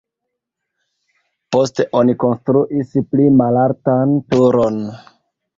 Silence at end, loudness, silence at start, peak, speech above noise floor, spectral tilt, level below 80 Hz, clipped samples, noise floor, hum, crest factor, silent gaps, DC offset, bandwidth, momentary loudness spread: 0.6 s; -15 LUFS; 1.5 s; -2 dBFS; 64 dB; -8 dB/octave; -54 dBFS; under 0.1%; -79 dBFS; none; 14 dB; none; under 0.1%; 7.6 kHz; 7 LU